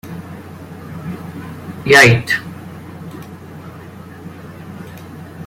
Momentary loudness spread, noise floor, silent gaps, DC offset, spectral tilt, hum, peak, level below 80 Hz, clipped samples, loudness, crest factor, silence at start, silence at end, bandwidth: 25 LU; -34 dBFS; none; under 0.1%; -4.5 dB/octave; none; 0 dBFS; -50 dBFS; under 0.1%; -11 LUFS; 20 dB; 0.05 s; 0 s; 16.5 kHz